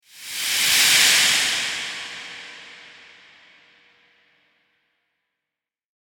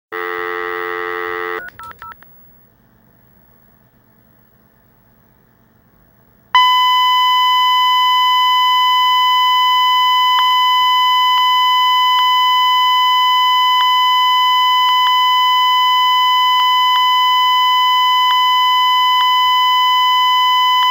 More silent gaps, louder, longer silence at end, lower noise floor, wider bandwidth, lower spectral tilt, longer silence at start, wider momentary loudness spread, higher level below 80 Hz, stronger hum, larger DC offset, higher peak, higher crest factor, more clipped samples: neither; second, -16 LUFS vs -12 LUFS; first, 3.15 s vs 0 s; first, -87 dBFS vs -52 dBFS; about the same, 19 kHz vs 19 kHz; about the same, 2 dB/octave vs 1 dB/octave; about the same, 0.15 s vs 0.1 s; first, 23 LU vs 10 LU; about the same, -66 dBFS vs -62 dBFS; neither; neither; about the same, -2 dBFS vs 0 dBFS; first, 22 dB vs 14 dB; neither